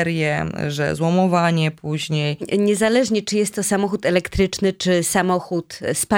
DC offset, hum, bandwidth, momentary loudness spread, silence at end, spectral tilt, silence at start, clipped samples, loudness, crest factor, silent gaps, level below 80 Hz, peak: under 0.1%; none; 17.5 kHz; 6 LU; 0 s; -5 dB/octave; 0 s; under 0.1%; -20 LUFS; 16 dB; none; -44 dBFS; -2 dBFS